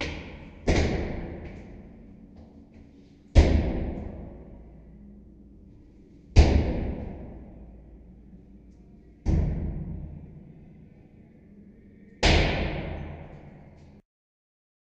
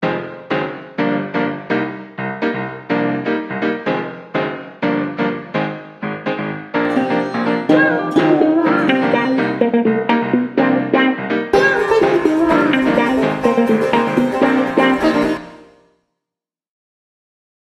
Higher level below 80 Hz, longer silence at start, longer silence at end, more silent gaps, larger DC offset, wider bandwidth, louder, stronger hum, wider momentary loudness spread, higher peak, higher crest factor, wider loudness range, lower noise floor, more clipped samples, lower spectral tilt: first, -32 dBFS vs -52 dBFS; about the same, 0 s vs 0 s; second, 1.3 s vs 2.15 s; neither; neither; second, 8.4 kHz vs 12 kHz; second, -27 LUFS vs -17 LUFS; neither; first, 28 LU vs 9 LU; second, -4 dBFS vs 0 dBFS; first, 26 dB vs 16 dB; about the same, 6 LU vs 6 LU; second, -52 dBFS vs -85 dBFS; neither; about the same, -6 dB/octave vs -6.5 dB/octave